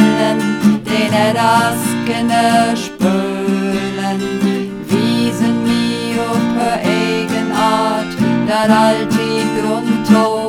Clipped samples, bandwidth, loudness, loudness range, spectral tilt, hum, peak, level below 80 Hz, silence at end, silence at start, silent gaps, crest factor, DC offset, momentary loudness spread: under 0.1%; 16.5 kHz; -15 LUFS; 2 LU; -5 dB/octave; none; 0 dBFS; -48 dBFS; 0 s; 0 s; none; 14 dB; under 0.1%; 5 LU